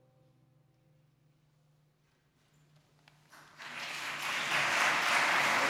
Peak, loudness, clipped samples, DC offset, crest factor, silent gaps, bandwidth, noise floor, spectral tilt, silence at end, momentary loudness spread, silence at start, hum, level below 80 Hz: -16 dBFS; -30 LUFS; under 0.1%; under 0.1%; 20 dB; none; 17 kHz; -72 dBFS; -1 dB/octave; 0 s; 15 LU; 3.35 s; none; -82 dBFS